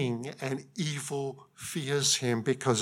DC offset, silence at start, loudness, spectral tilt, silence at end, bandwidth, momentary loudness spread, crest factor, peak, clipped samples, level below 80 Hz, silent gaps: under 0.1%; 0 s; -31 LUFS; -3.5 dB/octave; 0 s; 17 kHz; 11 LU; 18 dB; -12 dBFS; under 0.1%; -76 dBFS; none